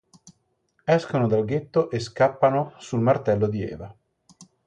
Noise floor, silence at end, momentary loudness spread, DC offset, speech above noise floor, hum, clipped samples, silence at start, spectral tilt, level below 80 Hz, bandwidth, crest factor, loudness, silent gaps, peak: -69 dBFS; 0.2 s; 11 LU; under 0.1%; 47 dB; none; under 0.1%; 0.25 s; -7.5 dB/octave; -56 dBFS; 9.6 kHz; 18 dB; -23 LUFS; none; -6 dBFS